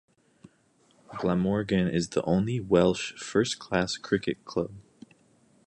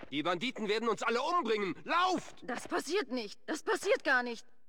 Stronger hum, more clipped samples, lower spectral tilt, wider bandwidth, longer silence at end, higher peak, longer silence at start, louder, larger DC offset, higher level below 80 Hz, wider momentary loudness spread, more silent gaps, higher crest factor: neither; neither; first, -5.5 dB/octave vs -3 dB/octave; second, 10 kHz vs 17 kHz; first, 0.85 s vs 0.3 s; first, -8 dBFS vs -18 dBFS; first, 1.1 s vs 0 s; first, -28 LUFS vs -33 LUFS; second, under 0.1% vs 0.3%; first, -54 dBFS vs -74 dBFS; about the same, 9 LU vs 9 LU; neither; about the same, 20 dB vs 16 dB